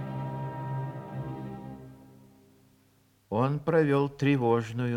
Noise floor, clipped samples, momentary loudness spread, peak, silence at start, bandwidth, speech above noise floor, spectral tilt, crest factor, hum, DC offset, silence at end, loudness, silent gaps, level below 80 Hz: -65 dBFS; under 0.1%; 17 LU; -10 dBFS; 0 s; 11 kHz; 39 dB; -8.5 dB/octave; 20 dB; none; under 0.1%; 0 s; -29 LUFS; none; -62 dBFS